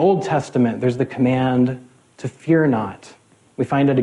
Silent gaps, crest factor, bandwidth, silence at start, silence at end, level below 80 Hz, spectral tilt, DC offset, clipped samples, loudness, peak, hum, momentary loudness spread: none; 14 dB; 11 kHz; 0 s; 0 s; -56 dBFS; -8 dB/octave; under 0.1%; under 0.1%; -19 LUFS; -4 dBFS; none; 15 LU